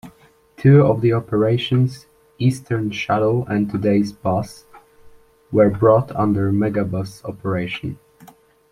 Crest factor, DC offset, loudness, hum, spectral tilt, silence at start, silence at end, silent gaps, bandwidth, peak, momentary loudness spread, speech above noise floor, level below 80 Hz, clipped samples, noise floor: 18 dB; under 0.1%; -19 LUFS; none; -8 dB/octave; 0.05 s; 0.75 s; none; 13 kHz; -2 dBFS; 13 LU; 33 dB; -50 dBFS; under 0.1%; -51 dBFS